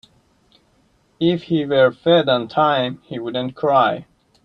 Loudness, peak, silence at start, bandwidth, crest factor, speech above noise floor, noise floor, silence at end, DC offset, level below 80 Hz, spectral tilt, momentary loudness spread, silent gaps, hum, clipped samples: -18 LUFS; -2 dBFS; 1.2 s; 6 kHz; 16 dB; 42 dB; -60 dBFS; 0.4 s; under 0.1%; -60 dBFS; -8 dB/octave; 10 LU; none; none; under 0.1%